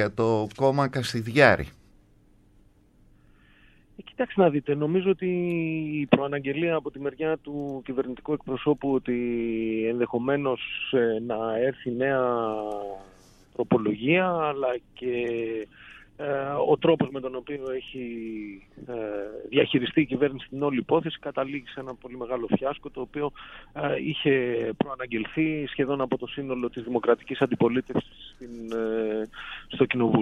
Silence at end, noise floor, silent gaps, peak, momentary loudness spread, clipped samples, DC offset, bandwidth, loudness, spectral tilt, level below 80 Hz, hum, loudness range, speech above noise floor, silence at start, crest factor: 0 s; -58 dBFS; none; -2 dBFS; 13 LU; under 0.1%; under 0.1%; 12.5 kHz; -27 LUFS; -7 dB/octave; -56 dBFS; none; 3 LU; 32 dB; 0 s; 24 dB